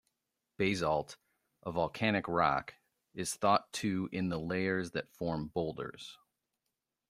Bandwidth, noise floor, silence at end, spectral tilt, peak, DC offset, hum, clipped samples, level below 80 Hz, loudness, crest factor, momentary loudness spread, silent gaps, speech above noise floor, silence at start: 15 kHz; -87 dBFS; 0.95 s; -5 dB/octave; -14 dBFS; under 0.1%; none; under 0.1%; -64 dBFS; -34 LUFS; 22 dB; 15 LU; none; 54 dB; 0.6 s